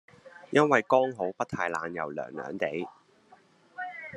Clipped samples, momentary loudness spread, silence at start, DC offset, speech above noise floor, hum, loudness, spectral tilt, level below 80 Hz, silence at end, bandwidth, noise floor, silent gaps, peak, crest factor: under 0.1%; 16 LU; 0.25 s; under 0.1%; 32 dB; none; -29 LUFS; -5.5 dB/octave; -74 dBFS; 0 s; 11 kHz; -60 dBFS; none; -6 dBFS; 24 dB